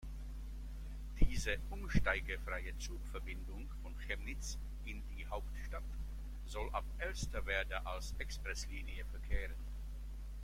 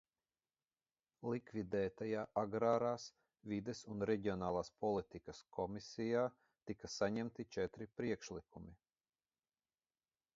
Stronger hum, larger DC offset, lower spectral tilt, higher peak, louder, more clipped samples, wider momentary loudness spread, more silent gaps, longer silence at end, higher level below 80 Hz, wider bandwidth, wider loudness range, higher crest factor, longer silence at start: neither; neither; about the same, -4.5 dB/octave vs -5.5 dB/octave; first, -16 dBFS vs -22 dBFS; about the same, -43 LUFS vs -42 LUFS; neither; second, 11 LU vs 14 LU; neither; second, 0 s vs 1.6 s; first, -42 dBFS vs -70 dBFS; first, 16 kHz vs 7.4 kHz; about the same, 5 LU vs 5 LU; about the same, 24 dB vs 22 dB; second, 0 s vs 1.2 s